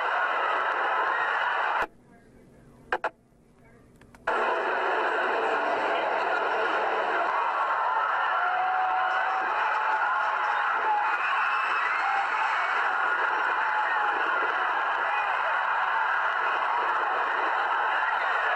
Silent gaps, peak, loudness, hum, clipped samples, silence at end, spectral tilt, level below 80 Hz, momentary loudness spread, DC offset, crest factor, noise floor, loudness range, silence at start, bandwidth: none; -14 dBFS; -26 LUFS; none; under 0.1%; 0 s; -2.5 dB/octave; -68 dBFS; 1 LU; under 0.1%; 12 dB; -59 dBFS; 5 LU; 0 s; 10 kHz